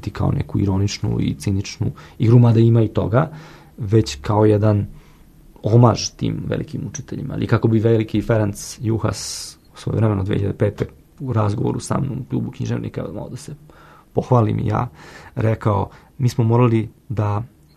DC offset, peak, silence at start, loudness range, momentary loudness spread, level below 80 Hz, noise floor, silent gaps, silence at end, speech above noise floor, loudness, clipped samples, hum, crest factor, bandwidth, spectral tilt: under 0.1%; 0 dBFS; 0 s; 6 LU; 14 LU; -42 dBFS; -46 dBFS; none; 0.3 s; 28 dB; -20 LUFS; under 0.1%; none; 18 dB; 13 kHz; -7 dB/octave